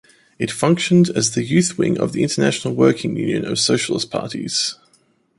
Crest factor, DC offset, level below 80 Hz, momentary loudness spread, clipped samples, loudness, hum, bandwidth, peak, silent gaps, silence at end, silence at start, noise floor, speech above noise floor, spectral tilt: 18 dB; under 0.1%; -56 dBFS; 8 LU; under 0.1%; -18 LUFS; none; 11.5 kHz; -2 dBFS; none; 0.65 s; 0.4 s; -59 dBFS; 41 dB; -4.5 dB/octave